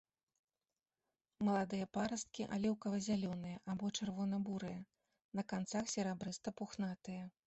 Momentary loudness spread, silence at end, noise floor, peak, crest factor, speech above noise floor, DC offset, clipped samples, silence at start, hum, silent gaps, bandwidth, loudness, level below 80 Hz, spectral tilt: 8 LU; 0.15 s; under -90 dBFS; -26 dBFS; 16 dB; over 49 dB; under 0.1%; under 0.1%; 1.4 s; none; 5.24-5.32 s; 8.2 kHz; -42 LUFS; -74 dBFS; -5 dB/octave